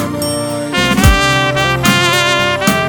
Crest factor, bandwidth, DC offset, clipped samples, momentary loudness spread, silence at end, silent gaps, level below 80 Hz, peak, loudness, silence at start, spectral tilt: 12 dB; 20 kHz; under 0.1%; 0.3%; 7 LU; 0 s; none; -24 dBFS; 0 dBFS; -12 LUFS; 0 s; -4 dB/octave